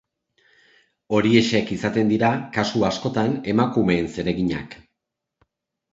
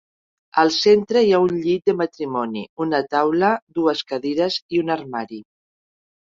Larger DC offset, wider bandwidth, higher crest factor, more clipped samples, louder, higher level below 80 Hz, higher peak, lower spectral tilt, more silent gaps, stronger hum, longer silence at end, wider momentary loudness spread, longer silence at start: neither; about the same, 7.8 kHz vs 7.6 kHz; about the same, 20 dB vs 18 dB; neither; about the same, -21 LUFS vs -20 LUFS; first, -50 dBFS vs -62 dBFS; about the same, -2 dBFS vs -2 dBFS; about the same, -6 dB/octave vs -5 dB/octave; second, none vs 2.69-2.77 s, 3.62-3.67 s, 4.62-4.69 s; neither; first, 1.2 s vs 0.9 s; second, 7 LU vs 10 LU; first, 1.1 s vs 0.55 s